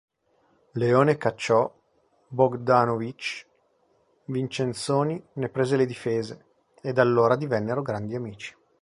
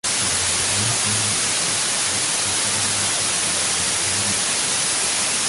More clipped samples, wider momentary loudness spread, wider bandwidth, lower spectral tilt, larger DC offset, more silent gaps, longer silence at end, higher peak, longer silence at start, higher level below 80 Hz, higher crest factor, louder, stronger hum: neither; first, 16 LU vs 1 LU; about the same, 11.5 kHz vs 12 kHz; first, -6.5 dB/octave vs -0.5 dB/octave; neither; neither; first, 0.3 s vs 0 s; first, -4 dBFS vs -8 dBFS; first, 0.75 s vs 0.05 s; second, -62 dBFS vs -48 dBFS; first, 22 dB vs 14 dB; second, -25 LUFS vs -18 LUFS; neither